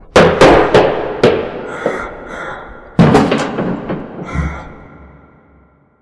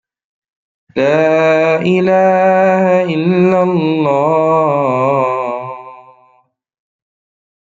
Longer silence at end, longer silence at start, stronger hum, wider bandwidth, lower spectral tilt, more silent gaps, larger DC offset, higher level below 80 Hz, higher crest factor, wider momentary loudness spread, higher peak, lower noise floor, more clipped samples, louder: second, 0.95 s vs 1.65 s; second, 0.15 s vs 0.95 s; neither; first, 11 kHz vs 7.6 kHz; second, -6 dB/octave vs -7.5 dB/octave; neither; neither; first, -32 dBFS vs -60 dBFS; about the same, 14 dB vs 12 dB; first, 19 LU vs 8 LU; about the same, 0 dBFS vs 0 dBFS; second, -49 dBFS vs -54 dBFS; neither; about the same, -13 LUFS vs -12 LUFS